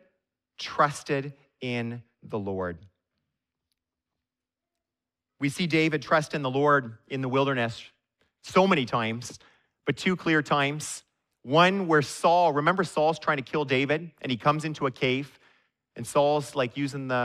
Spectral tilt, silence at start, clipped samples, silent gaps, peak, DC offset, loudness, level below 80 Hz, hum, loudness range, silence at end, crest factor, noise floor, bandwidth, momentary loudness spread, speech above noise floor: -5 dB/octave; 0.6 s; under 0.1%; none; -6 dBFS; under 0.1%; -26 LUFS; -66 dBFS; none; 13 LU; 0 s; 22 dB; -89 dBFS; 14.5 kHz; 15 LU; 63 dB